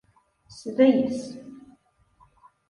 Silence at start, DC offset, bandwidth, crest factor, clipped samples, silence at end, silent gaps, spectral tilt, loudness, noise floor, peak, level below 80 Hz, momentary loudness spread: 0.55 s; under 0.1%; 11 kHz; 20 dB; under 0.1%; 1.15 s; none; -6 dB/octave; -23 LUFS; -61 dBFS; -6 dBFS; -66 dBFS; 23 LU